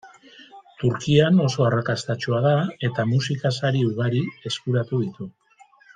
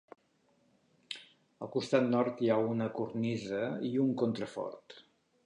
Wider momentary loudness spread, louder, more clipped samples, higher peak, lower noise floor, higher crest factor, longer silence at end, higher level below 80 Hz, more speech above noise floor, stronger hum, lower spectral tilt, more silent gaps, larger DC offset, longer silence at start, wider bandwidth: second, 8 LU vs 15 LU; first, -22 LUFS vs -33 LUFS; neither; first, -4 dBFS vs -14 dBFS; second, -55 dBFS vs -72 dBFS; about the same, 18 dB vs 20 dB; first, 0.65 s vs 0.45 s; first, -60 dBFS vs -76 dBFS; second, 33 dB vs 39 dB; neither; about the same, -6.5 dB/octave vs -7 dB/octave; neither; neither; second, 0.05 s vs 1.1 s; second, 9.4 kHz vs 10.5 kHz